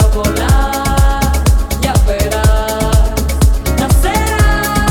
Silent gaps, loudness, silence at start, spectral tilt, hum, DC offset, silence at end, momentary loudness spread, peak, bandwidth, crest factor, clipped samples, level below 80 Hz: none; -13 LUFS; 0 s; -5 dB/octave; none; under 0.1%; 0 s; 2 LU; 0 dBFS; 18 kHz; 10 dB; under 0.1%; -14 dBFS